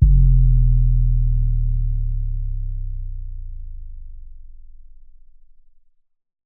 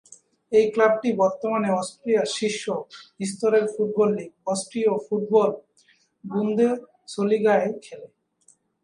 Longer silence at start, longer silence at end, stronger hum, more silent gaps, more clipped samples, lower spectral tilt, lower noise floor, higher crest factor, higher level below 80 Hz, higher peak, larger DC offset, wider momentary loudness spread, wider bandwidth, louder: second, 0 s vs 0.5 s; second, 0 s vs 0.8 s; neither; neither; neither; first, -16 dB/octave vs -5 dB/octave; second, -52 dBFS vs -62 dBFS; about the same, 16 dB vs 18 dB; first, -20 dBFS vs -72 dBFS; first, -2 dBFS vs -6 dBFS; neither; first, 23 LU vs 12 LU; second, 0.4 kHz vs 11 kHz; about the same, -21 LUFS vs -23 LUFS